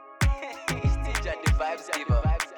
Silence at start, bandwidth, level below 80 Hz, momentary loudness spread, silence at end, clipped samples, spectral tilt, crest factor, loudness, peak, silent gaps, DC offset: 0 s; 18.5 kHz; -28 dBFS; 5 LU; 0 s; under 0.1%; -5 dB/octave; 14 dB; -28 LUFS; -12 dBFS; none; under 0.1%